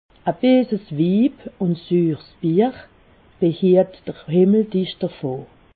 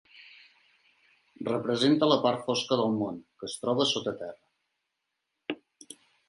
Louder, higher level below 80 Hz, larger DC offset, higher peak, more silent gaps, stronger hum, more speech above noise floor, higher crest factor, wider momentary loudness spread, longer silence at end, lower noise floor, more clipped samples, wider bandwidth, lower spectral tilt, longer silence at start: first, -19 LUFS vs -28 LUFS; first, -58 dBFS vs -74 dBFS; neither; first, -4 dBFS vs -8 dBFS; neither; neither; second, 33 dB vs 55 dB; second, 16 dB vs 22 dB; second, 10 LU vs 19 LU; about the same, 0.3 s vs 0.35 s; second, -51 dBFS vs -83 dBFS; neither; second, 4.7 kHz vs 11.5 kHz; first, -12.5 dB/octave vs -4.5 dB/octave; about the same, 0.25 s vs 0.15 s